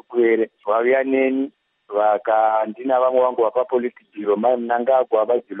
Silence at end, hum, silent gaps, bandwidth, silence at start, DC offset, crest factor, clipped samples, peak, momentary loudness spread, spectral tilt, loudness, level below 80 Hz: 0 s; none; none; 3.8 kHz; 0.1 s; under 0.1%; 14 dB; under 0.1%; -4 dBFS; 6 LU; -3.5 dB/octave; -19 LUFS; -80 dBFS